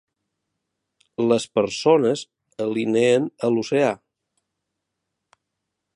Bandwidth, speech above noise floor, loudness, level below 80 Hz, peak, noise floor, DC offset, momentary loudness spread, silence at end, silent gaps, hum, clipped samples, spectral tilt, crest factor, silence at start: 11 kHz; 61 dB; -21 LUFS; -68 dBFS; -4 dBFS; -80 dBFS; under 0.1%; 11 LU; 2 s; none; none; under 0.1%; -5.5 dB/octave; 20 dB; 1.2 s